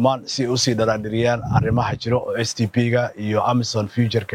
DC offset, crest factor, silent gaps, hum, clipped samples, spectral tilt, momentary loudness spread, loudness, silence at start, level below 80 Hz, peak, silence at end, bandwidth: under 0.1%; 16 dB; none; none; under 0.1%; -5.5 dB/octave; 4 LU; -20 LUFS; 0 s; -46 dBFS; -4 dBFS; 0 s; 12.5 kHz